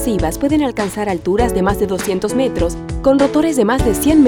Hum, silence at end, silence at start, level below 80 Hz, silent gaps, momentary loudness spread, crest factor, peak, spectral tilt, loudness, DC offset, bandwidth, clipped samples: none; 0 s; 0 s; -28 dBFS; none; 6 LU; 12 dB; -2 dBFS; -5.5 dB/octave; -16 LUFS; under 0.1%; 19 kHz; under 0.1%